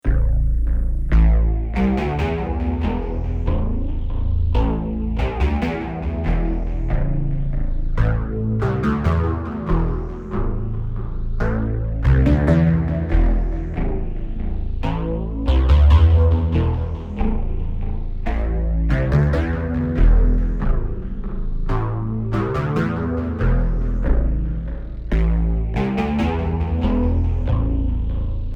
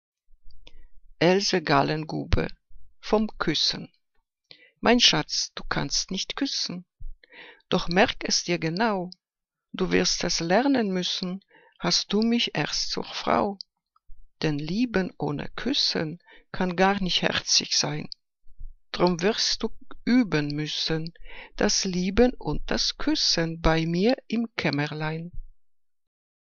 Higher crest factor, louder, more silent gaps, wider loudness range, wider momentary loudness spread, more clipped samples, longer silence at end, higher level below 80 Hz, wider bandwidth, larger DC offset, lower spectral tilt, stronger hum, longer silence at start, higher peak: second, 14 dB vs 24 dB; first, -21 LUFS vs -25 LUFS; neither; about the same, 4 LU vs 3 LU; second, 10 LU vs 13 LU; neither; second, 0 s vs 1 s; first, -20 dBFS vs -42 dBFS; second, 5.6 kHz vs 7.4 kHz; neither; first, -9.5 dB/octave vs -3.5 dB/octave; neither; second, 0.05 s vs 0.3 s; about the same, -4 dBFS vs -2 dBFS